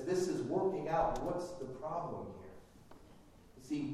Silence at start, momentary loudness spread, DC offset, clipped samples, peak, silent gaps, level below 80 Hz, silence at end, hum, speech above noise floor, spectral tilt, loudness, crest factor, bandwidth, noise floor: 0 s; 16 LU; under 0.1%; under 0.1%; -22 dBFS; none; -56 dBFS; 0 s; none; 22 dB; -6.5 dB/octave; -38 LUFS; 18 dB; 14 kHz; -59 dBFS